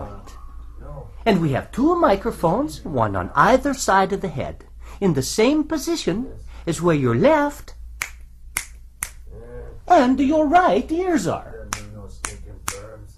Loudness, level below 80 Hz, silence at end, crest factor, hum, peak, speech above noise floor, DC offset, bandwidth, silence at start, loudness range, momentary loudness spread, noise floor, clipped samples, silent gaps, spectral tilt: -20 LUFS; -38 dBFS; 0.05 s; 20 dB; none; -2 dBFS; 21 dB; under 0.1%; 15 kHz; 0 s; 3 LU; 22 LU; -39 dBFS; under 0.1%; none; -5.5 dB/octave